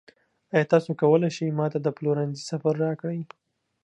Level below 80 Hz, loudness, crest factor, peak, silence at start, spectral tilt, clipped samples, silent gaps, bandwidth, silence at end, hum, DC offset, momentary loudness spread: -74 dBFS; -25 LUFS; 20 dB; -6 dBFS; 0.55 s; -7 dB/octave; under 0.1%; none; 9.8 kHz; 0.6 s; none; under 0.1%; 10 LU